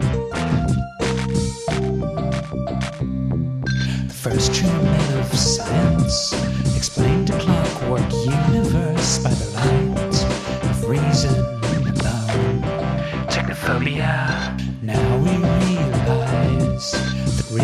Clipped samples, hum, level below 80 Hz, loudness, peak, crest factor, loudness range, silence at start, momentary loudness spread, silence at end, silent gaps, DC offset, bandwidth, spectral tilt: under 0.1%; none; -32 dBFS; -20 LUFS; -4 dBFS; 16 dB; 4 LU; 0 s; 5 LU; 0 s; none; under 0.1%; 14 kHz; -5.5 dB/octave